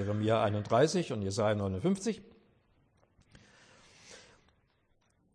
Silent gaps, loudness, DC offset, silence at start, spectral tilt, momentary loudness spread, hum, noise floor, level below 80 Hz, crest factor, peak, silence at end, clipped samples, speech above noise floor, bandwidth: none; -31 LUFS; under 0.1%; 0 s; -6 dB/octave; 21 LU; none; -72 dBFS; -68 dBFS; 20 dB; -14 dBFS; 1.15 s; under 0.1%; 42 dB; 10.5 kHz